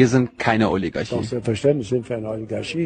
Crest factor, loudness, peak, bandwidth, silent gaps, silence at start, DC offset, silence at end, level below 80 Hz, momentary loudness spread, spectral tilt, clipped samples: 20 dB; -22 LUFS; -2 dBFS; 9.8 kHz; none; 0 s; under 0.1%; 0 s; -50 dBFS; 9 LU; -6.5 dB/octave; under 0.1%